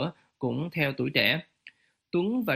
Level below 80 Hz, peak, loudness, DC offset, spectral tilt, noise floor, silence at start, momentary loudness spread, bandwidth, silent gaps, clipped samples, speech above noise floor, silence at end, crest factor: -66 dBFS; -8 dBFS; -28 LUFS; under 0.1%; -7 dB/octave; -56 dBFS; 0 s; 9 LU; 15.5 kHz; none; under 0.1%; 29 dB; 0 s; 20 dB